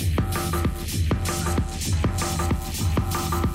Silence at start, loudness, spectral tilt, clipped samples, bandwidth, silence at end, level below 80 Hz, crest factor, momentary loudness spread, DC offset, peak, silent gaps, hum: 0 s; -25 LUFS; -5 dB/octave; under 0.1%; 16 kHz; 0 s; -30 dBFS; 10 dB; 2 LU; under 0.1%; -14 dBFS; none; none